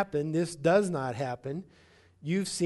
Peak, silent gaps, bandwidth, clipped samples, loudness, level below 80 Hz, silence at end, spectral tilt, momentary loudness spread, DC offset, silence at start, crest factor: -12 dBFS; none; 11.5 kHz; under 0.1%; -30 LUFS; -64 dBFS; 0 s; -5.5 dB/octave; 14 LU; under 0.1%; 0 s; 18 dB